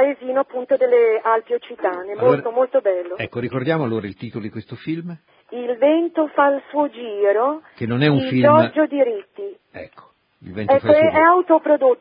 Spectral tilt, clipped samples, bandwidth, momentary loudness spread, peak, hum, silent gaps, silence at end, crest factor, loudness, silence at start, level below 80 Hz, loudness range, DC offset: -11.5 dB/octave; under 0.1%; 5.2 kHz; 17 LU; 0 dBFS; none; none; 0.05 s; 18 dB; -18 LUFS; 0 s; -58 dBFS; 5 LU; under 0.1%